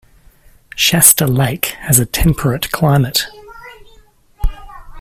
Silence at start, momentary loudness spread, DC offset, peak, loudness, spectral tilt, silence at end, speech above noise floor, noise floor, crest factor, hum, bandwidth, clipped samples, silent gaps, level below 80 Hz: 0.75 s; 18 LU; under 0.1%; 0 dBFS; -12 LUFS; -3.5 dB/octave; 0 s; 33 dB; -47 dBFS; 16 dB; none; 19 kHz; 0.2%; none; -28 dBFS